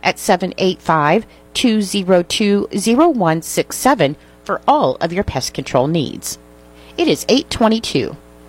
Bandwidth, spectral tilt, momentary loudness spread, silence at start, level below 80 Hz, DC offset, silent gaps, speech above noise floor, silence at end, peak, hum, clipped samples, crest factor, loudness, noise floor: 16.5 kHz; -4.5 dB/octave; 9 LU; 0.05 s; -42 dBFS; under 0.1%; none; 26 dB; 0.3 s; 0 dBFS; none; under 0.1%; 16 dB; -16 LUFS; -42 dBFS